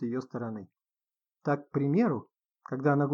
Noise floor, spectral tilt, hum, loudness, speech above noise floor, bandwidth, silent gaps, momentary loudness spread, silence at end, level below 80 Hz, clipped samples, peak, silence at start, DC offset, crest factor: under -90 dBFS; -10 dB/octave; none; -31 LUFS; over 61 dB; 6.8 kHz; none; 13 LU; 0 s; -82 dBFS; under 0.1%; -14 dBFS; 0 s; under 0.1%; 18 dB